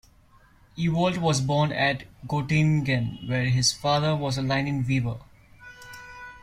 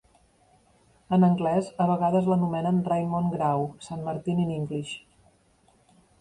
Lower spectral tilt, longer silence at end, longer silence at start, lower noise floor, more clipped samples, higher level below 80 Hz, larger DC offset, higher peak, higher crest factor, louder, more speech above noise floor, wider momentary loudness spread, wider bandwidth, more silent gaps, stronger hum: second, -5 dB/octave vs -8 dB/octave; second, 0.05 s vs 1.2 s; second, 0.75 s vs 1.1 s; second, -56 dBFS vs -63 dBFS; neither; first, -52 dBFS vs -62 dBFS; neither; first, -8 dBFS vs -12 dBFS; about the same, 16 dB vs 16 dB; about the same, -25 LUFS vs -26 LUFS; second, 32 dB vs 38 dB; first, 19 LU vs 12 LU; first, 14 kHz vs 10.5 kHz; neither; neither